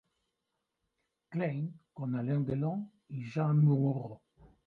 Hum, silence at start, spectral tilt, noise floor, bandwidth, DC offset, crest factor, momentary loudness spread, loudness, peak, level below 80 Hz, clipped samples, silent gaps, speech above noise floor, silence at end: none; 1.3 s; -10.5 dB/octave; -85 dBFS; 4.7 kHz; under 0.1%; 16 dB; 15 LU; -33 LUFS; -18 dBFS; -70 dBFS; under 0.1%; none; 54 dB; 0.5 s